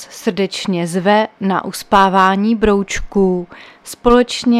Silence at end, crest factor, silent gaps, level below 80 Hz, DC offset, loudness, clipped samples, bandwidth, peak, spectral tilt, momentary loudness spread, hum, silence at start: 0 s; 14 dB; none; -34 dBFS; under 0.1%; -15 LUFS; under 0.1%; 14.5 kHz; 0 dBFS; -5 dB/octave; 10 LU; none; 0 s